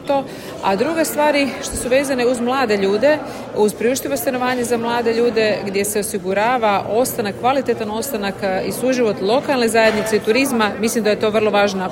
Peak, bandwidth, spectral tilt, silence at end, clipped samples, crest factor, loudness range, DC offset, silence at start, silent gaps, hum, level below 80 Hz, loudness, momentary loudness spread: -2 dBFS; 16.5 kHz; -4 dB/octave; 0 s; under 0.1%; 14 dB; 2 LU; under 0.1%; 0 s; none; none; -48 dBFS; -18 LUFS; 6 LU